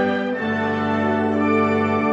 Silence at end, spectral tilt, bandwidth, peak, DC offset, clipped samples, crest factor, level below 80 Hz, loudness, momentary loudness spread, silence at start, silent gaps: 0 s; -7.5 dB/octave; 7.6 kHz; -6 dBFS; under 0.1%; under 0.1%; 14 dB; -62 dBFS; -20 LUFS; 4 LU; 0 s; none